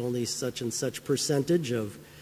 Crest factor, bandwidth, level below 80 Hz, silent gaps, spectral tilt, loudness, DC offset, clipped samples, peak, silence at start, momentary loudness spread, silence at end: 16 dB; 16 kHz; -64 dBFS; none; -4.5 dB/octave; -29 LUFS; under 0.1%; under 0.1%; -14 dBFS; 0 s; 6 LU; 0 s